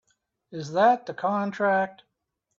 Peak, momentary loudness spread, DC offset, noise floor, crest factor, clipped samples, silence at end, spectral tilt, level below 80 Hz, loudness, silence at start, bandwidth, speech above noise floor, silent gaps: -8 dBFS; 14 LU; under 0.1%; -80 dBFS; 18 dB; under 0.1%; 0.65 s; -6 dB/octave; -72 dBFS; -25 LUFS; 0.5 s; 7.6 kHz; 56 dB; none